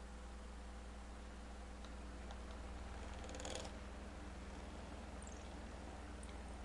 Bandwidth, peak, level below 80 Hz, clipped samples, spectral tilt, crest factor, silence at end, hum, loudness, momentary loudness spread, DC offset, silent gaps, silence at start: 11.5 kHz; -30 dBFS; -54 dBFS; under 0.1%; -4.5 dB/octave; 20 dB; 0 s; none; -52 LUFS; 5 LU; under 0.1%; none; 0 s